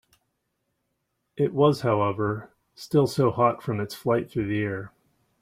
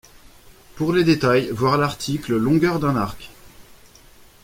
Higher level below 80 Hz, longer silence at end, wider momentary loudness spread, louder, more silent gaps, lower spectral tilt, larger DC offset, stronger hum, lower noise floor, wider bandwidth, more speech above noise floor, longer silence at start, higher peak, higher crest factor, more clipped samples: second, -60 dBFS vs -48 dBFS; second, 0.55 s vs 0.8 s; first, 14 LU vs 9 LU; second, -25 LUFS vs -20 LUFS; neither; about the same, -7 dB/octave vs -6.5 dB/octave; neither; neither; first, -77 dBFS vs -48 dBFS; about the same, 16 kHz vs 16.5 kHz; first, 53 dB vs 29 dB; first, 1.35 s vs 0.75 s; about the same, -6 dBFS vs -4 dBFS; about the same, 20 dB vs 18 dB; neither